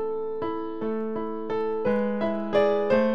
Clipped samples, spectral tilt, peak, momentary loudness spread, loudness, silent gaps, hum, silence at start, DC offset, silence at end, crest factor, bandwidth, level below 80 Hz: under 0.1%; -8 dB/octave; -10 dBFS; 8 LU; -27 LUFS; none; none; 0 s; 1%; 0 s; 16 dB; 6.4 kHz; -60 dBFS